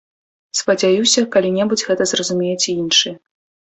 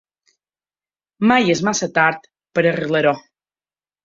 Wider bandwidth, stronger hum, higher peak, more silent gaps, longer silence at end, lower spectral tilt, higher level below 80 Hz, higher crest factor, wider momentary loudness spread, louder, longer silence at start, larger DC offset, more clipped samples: about the same, 8.4 kHz vs 7.8 kHz; second, none vs 50 Hz at -50 dBFS; about the same, -2 dBFS vs -2 dBFS; neither; second, 0.5 s vs 0.85 s; second, -2.5 dB/octave vs -4.5 dB/octave; about the same, -60 dBFS vs -62 dBFS; about the same, 16 dB vs 18 dB; second, 6 LU vs 9 LU; about the same, -16 LUFS vs -17 LUFS; second, 0.55 s vs 1.2 s; neither; neither